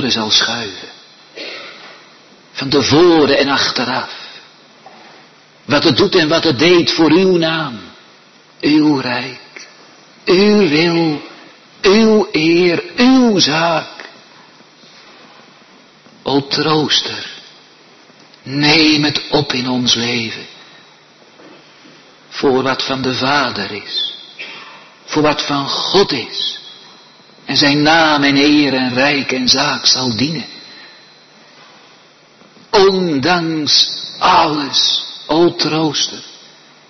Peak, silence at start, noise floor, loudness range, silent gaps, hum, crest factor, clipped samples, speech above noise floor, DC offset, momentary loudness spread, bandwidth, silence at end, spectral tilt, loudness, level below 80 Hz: 0 dBFS; 0 s; -46 dBFS; 6 LU; none; none; 16 dB; under 0.1%; 33 dB; under 0.1%; 19 LU; 6.4 kHz; 0.55 s; -4 dB/octave; -13 LUFS; -50 dBFS